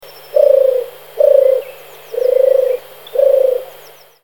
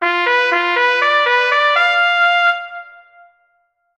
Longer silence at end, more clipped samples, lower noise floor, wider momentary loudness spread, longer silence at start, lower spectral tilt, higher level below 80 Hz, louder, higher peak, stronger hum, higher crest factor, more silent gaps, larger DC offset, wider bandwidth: second, 0.55 s vs 1.05 s; neither; second, -41 dBFS vs -64 dBFS; first, 14 LU vs 6 LU; first, 0.35 s vs 0 s; first, -3 dB/octave vs -0.5 dB/octave; about the same, -62 dBFS vs -66 dBFS; about the same, -13 LUFS vs -13 LUFS; about the same, 0 dBFS vs 0 dBFS; first, 50 Hz at -60 dBFS vs none; about the same, 14 dB vs 16 dB; neither; first, 0.4% vs under 0.1%; first, 18 kHz vs 9 kHz